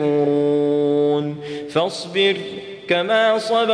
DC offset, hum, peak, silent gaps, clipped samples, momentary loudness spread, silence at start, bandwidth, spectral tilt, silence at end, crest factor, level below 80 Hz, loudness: under 0.1%; none; -4 dBFS; none; under 0.1%; 10 LU; 0 s; 10.5 kHz; -5.5 dB/octave; 0 s; 14 dB; -64 dBFS; -19 LUFS